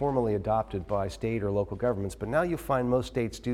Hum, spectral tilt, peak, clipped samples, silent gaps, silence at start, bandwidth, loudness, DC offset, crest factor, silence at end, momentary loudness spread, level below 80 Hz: none; -7 dB/octave; -12 dBFS; under 0.1%; none; 0 s; 16 kHz; -29 LUFS; under 0.1%; 16 dB; 0 s; 5 LU; -46 dBFS